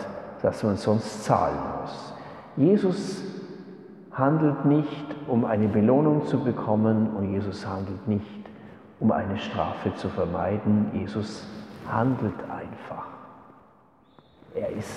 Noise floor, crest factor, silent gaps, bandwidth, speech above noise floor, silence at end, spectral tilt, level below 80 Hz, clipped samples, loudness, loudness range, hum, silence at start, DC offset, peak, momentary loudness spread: -58 dBFS; 22 dB; none; 11.5 kHz; 33 dB; 0 s; -8 dB/octave; -58 dBFS; under 0.1%; -26 LUFS; 6 LU; none; 0 s; under 0.1%; -6 dBFS; 18 LU